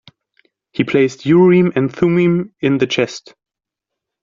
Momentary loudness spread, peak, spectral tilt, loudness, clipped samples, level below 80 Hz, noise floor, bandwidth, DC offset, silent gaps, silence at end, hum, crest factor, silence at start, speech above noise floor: 11 LU; -2 dBFS; -6 dB/octave; -15 LUFS; under 0.1%; -56 dBFS; -81 dBFS; 7.6 kHz; under 0.1%; none; 1.05 s; none; 14 dB; 0.8 s; 67 dB